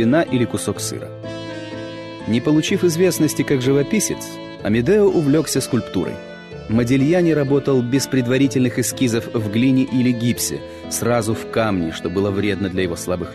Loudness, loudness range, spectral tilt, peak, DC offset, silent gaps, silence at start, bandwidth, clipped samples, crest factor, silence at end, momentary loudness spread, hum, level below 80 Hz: -19 LUFS; 3 LU; -5.5 dB/octave; -6 dBFS; under 0.1%; none; 0 s; 13.5 kHz; under 0.1%; 12 dB; 0 s; 14 LU; none; -48 dBFS